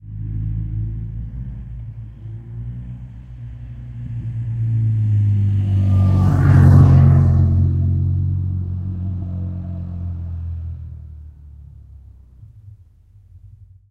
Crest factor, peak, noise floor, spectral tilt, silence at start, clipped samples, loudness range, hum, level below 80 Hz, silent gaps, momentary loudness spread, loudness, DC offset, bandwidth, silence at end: 18 dB; -2 dBFS; -48 dBFS; -10.5 dB/octave; 0 s; under 0.1%; 18 LU; none; -32 dBFS; none; 23 LU; -18 LUFS; under 0.1%; 3.2 kHz; 0.25 s